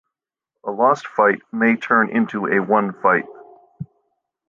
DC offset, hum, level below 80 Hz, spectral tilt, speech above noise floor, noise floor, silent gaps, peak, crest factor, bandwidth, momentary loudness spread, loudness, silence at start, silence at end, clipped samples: under 0.1%; none; -68 dBFS; -7 dB/octave; 65 dB; -83 dBFS; none; -2 dBFS; 18 dB; 7.2 kHz; 20 LU; -18 LUFS; 0.65 s; 0.65 s; under 0.1%